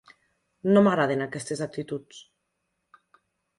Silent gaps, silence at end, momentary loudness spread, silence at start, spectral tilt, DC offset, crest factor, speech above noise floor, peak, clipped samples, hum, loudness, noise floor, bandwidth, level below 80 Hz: none; 1.4 s; 15 LU; 0.65 s; -6.5 dB/octave; under 0.1%; 20 dB; 54 dB; -8 dBFS; under 0.1%; none; -25 LUFS; -78 dBFS; 11.5 kHz; -68 dBFS